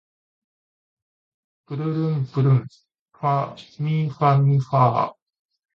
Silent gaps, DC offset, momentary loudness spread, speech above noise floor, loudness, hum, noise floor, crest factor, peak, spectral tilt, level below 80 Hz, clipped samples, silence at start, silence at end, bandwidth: 2.99-3.06 s; under 0.1%; 11 LU; over 70 dB; -21 LUFS; none; under -90 dBFS; 20 dB; -4 dBFS; -9.5 dB/octave; -62 dBFS; under 0.1%; 1.7 s; 0.6 s; 6 kHz